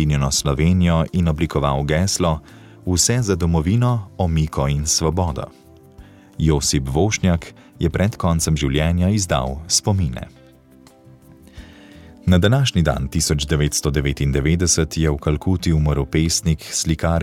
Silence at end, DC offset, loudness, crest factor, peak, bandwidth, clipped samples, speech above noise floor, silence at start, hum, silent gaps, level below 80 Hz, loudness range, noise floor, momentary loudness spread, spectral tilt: 0 s; under 0.1%; -19 LUFS; 16 dB; -2 dBFS; 16 kHz; under 0.1%; 30 dB; 0 s; none; none; -30 dBFS; 3 LU; -48 dBFS; 6 LU; -5 dB/octave